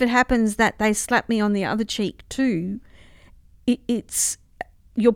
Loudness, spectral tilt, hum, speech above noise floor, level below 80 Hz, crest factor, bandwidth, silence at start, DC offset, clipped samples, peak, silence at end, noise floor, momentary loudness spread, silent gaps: -22 LUFS; -4 dB/octave; none; 28 dB; -44 dBFS; 18 dB; 16.5 kHz; 0 s; under 0.1%; under 0.1%; -4 dBFS; 0 s; -50 dBFS; 12 LU; none